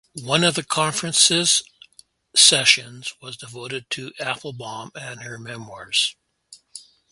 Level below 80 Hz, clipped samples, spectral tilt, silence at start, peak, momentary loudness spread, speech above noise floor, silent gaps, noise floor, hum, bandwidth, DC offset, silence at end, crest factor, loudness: -66 dBFS; under 0.1%; -1 dB/octave; 0.15 s; 0 dBFS; 21 LU; 32 dB; none; -54 dBFS; none; 12 kHz; under 0.1%; 0.3 s; 24 dB; -18 LUFS